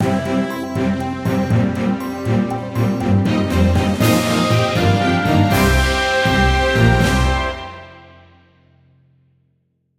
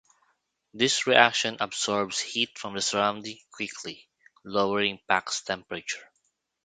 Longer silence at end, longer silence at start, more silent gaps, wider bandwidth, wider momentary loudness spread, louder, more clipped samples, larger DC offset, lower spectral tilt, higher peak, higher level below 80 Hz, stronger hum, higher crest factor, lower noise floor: first, 2 s vs 0.6 s; second, 0 s vs 0.75 s; neither; first, 16.5 kHz vs 9.6 kHz; second, 7 LU vs 17 LU; first, -17 LUFS vs -26 LUFS; neither; neither; first, -6 dB/octave vs -2 dB/octave; about the same, -2 dBFS vs 0 dBFS; first, -28 dBFS vs -68 dBFS; neither; second, 16 dB vs 28 dB; second, -65 dBFS vs -75 dBFS